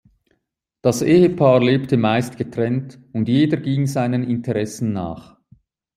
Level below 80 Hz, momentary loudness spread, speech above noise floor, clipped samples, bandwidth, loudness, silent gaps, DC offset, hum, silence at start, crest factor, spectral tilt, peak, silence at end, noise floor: -56 dBFS; 12 LU; 55 dB; under 0.1%; 15.5 kHz; -19 LUFS; none; under 0.1%; none; 0.85 s; 18 dB; -7 dB/octave; -2 dBFS; 0.75 s; -73 dBFS